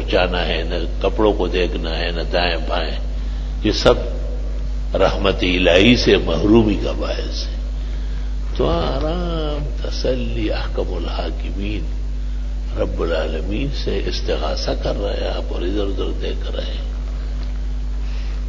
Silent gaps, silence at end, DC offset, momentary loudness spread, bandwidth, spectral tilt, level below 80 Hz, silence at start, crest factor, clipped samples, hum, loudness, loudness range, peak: none; 0 s; under 0.1%; 12 LU; 7.6 kHz; -6 dB/octave; -22 dBFS; 0 s; 18 dB; under 0.1%; none; -20 LUFS; 8 LU; 0 dBFS